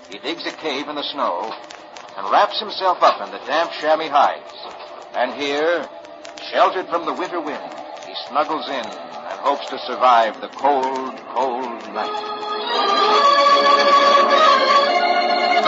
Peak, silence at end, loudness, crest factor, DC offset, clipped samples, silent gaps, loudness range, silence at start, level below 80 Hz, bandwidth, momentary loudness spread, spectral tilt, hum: 0 dBFS; 0 s; -18 LUFS; 18 dB; under 0.1%; under 0.1%; none; 8 LU; 0 s; -72 dBFS; 7.8 kHz; 18 LU; -2 dB/octave; none